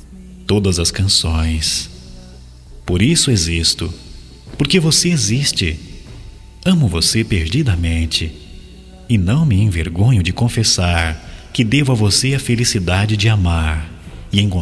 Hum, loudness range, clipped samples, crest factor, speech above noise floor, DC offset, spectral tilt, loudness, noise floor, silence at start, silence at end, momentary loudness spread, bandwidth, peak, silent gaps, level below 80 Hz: none; 2 LU; under 0.1%; 14 dB; 23 dB; under 0.1%; -4 dB/octave; -15 LUFS; -37 dBFS; 0.1 s; 0 s; 13 LU; 11 kHz; -2 dBFS; none; -28 dBFS